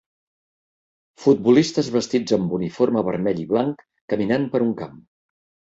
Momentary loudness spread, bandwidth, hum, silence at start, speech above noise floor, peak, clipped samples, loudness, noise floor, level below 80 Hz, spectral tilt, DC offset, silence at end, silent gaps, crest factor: 10 LU; 8 kHz; none; 1.2 s; over 70 dB; -4 dBFS; under 0.1%; -21 LUFS; under -90 dBFS; -58 dBFS; -6.5 dB/octave; under 0.1%; 0.8 s; 4.01-4.08 s; 18 dB